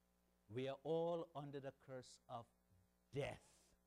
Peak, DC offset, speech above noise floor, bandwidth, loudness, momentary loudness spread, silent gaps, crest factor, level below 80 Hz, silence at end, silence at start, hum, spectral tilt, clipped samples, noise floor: -34 dBFS; under 0.1%; 31 dB; 13.5 kHz; -49 LUFS; 14 LU; none; 16 dB; -78 dBFS; 0.4 s; 0.5 s; none; -6.5 dB/octave; under 0.1%; -79 dBFS